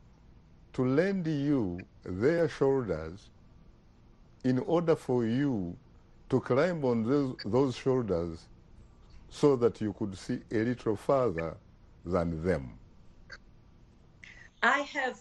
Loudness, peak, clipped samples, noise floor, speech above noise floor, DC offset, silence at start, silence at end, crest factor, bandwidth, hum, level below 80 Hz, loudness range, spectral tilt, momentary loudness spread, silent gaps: -30 LUFS; -12 dBFS; under 0.1%; -58 dBFS; 29 dB; under 0.1%; 0.75 s; 0.05 s; 20 dB; 11.5 kHz; none; -56 dBFS; 4 LU; -7 dB/octave; 20 LU; none